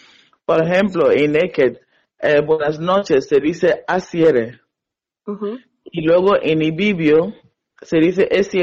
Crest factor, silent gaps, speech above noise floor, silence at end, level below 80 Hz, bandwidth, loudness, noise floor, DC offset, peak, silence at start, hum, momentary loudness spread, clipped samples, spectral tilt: 12 dB; none; 69 dB; 0 s; -52 dBFS; 7.6 kHz; -16 LUFS; -85 dBFS; under 0.1%; -4 dBFS; 0.5 s; none; 12 LU; under 0.1%; -6.5 dB/octave